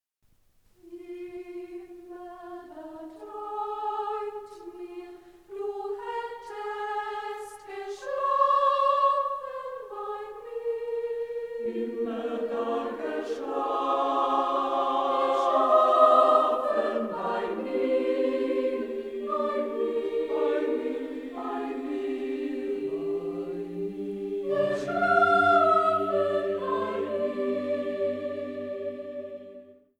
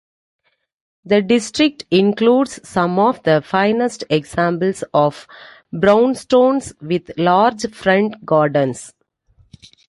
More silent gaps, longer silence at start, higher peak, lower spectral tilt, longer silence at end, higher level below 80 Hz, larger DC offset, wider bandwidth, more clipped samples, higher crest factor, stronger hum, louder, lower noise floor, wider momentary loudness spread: neither; second, 0.85 s vs 1.05 s; second, -8 dBFS vs -2 dBFS; about the same, -5.5 dB/octave vs -5.5 dB/octave; second, 0.25 s vs 1 s; second, -68 dBFS vs -54 dBFS; neither; about the same, 12.5 kHz vs 11.5 kHz; neither; first, 20 dB vs 14 dB; neither; second, -27 LUFS vs -16 LUFS; first, -66 dBFS vs -56 dBFS; first, 19 LU vs 7 LU